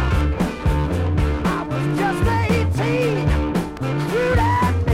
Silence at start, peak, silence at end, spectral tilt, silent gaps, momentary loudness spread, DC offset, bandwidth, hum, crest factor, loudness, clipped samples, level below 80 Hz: 0 s; -6 dBFS; 0 s; -7 dB/octave; none; 4 LU; under 0.1%; 15.5 kHz; none; 12 dB; -20 LUFS; under 0.1%; -26 dBFS